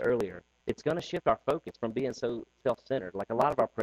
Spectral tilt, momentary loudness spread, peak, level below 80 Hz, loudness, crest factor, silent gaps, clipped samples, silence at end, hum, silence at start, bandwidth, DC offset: -6.5 dB/octave; 7 LU; -12 dBFS; -60 dBFS; -32 LUFS; 20 dB; none; under 0.1%; 0 s; none; 0 s; 13 kHz; under 0.1%